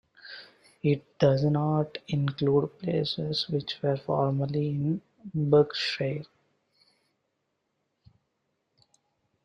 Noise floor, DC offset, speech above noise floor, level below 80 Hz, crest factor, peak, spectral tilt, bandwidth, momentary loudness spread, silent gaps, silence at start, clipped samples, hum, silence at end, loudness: -79 dBFS; under 0.1%; 52 dB; -64 dBFS; 20 dB; -8 dBFS; -7.5 dB/octave; 7.4 kHz; 12 LU; none; 0.25 s; under 0.1%; none; 3.2 s; -28 LUFS